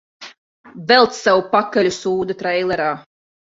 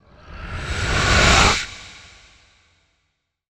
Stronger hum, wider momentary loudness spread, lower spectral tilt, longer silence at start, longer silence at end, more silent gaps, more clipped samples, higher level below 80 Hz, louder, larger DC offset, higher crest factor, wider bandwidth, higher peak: neither; second, 9 LU vs 25 LU; about the same, -4 dB/octave vs -3 dB/octave; about the same, 0.2 s vs 0.25 s; second, 0.5 s vs 1.5 s; first, 0.38-0.64 s vs none; neither; second, -58 dBFS vs -30 dBFS; about the same, -17 LUFS vs -16 LUFS; neither; about the same, 18 dB vs 20 dB; second, 7.8 kHz vs 16 kHz; about the same, -2 dBFS vs -2 dBFS